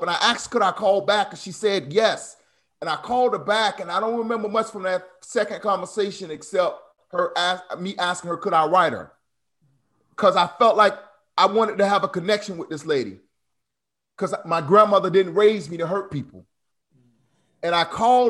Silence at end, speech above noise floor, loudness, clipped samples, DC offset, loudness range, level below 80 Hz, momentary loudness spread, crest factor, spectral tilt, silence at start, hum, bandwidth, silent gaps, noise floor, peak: 0 s; 64 dB; -22 LUFS; under 0.1%; under 0.1%; 4 LU; -66 dBFS; 13 LU; 20 dB; -4 dB/octave; 0 s; none; 12 kHz; none; -85 dBFS; -2 dBFS